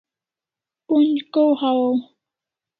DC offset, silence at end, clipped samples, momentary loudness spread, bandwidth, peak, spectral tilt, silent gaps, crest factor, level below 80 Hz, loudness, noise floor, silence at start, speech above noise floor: under 0.1%; 0.75 s; under 0.1%; 4 LU; 4.7 kHz; -6 dBFS; -8.5 dB/octave; none; 14 dB; -76 dBFS; -19 LUFS; -89 dBFS; 0.9 s; 71 dB